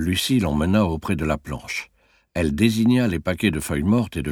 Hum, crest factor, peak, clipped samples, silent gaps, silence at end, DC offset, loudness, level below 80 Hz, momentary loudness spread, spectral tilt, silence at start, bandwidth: none; 18 dB; -4 dBFS; under 0.1%; none; 0 s; under 0.1%; -22 LUFS; -38 dBFS; 10 LU; -5.5 dB/octave; 0 s; 18 kHz